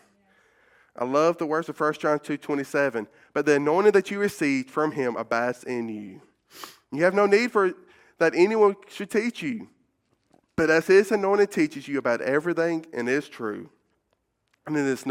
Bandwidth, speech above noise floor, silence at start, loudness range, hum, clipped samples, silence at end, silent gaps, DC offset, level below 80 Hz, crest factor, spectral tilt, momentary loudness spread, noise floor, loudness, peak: 15.5 kHz; 50 dB; 1 s; 3 LU; none; under 0.1%; 0 s; none; under 0.1%; -68 dBFS; 20 dB; -5.5 dB/octave; 15 LU; -74 dBFS; -24 LUFS; -6 dBFS